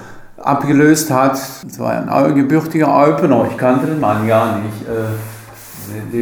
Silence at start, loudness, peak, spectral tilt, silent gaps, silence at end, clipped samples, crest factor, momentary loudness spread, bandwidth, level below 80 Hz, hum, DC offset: 0 s; -14 LUFS; 0 dBFS; -6 dB/octave; none; 0 s; under 0.1%; 14 dB; 16 LU; over 20 kHz; -52 dBFS; none; under 0.1%